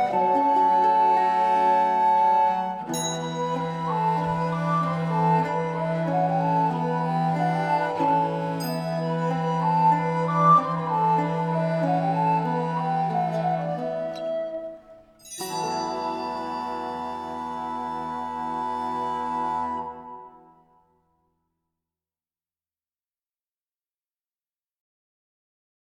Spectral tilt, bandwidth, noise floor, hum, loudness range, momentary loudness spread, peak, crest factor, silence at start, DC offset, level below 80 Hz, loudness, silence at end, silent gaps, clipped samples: -6 dB/octave; 13.5 kHz; under -90 dBFS; none; 9 LU; 11 LU; -8 dBFS; 18 dB; 0 s; under 0.1%; -62 dBFS; -24 LUFS; 5.6 s; none; under 0.1%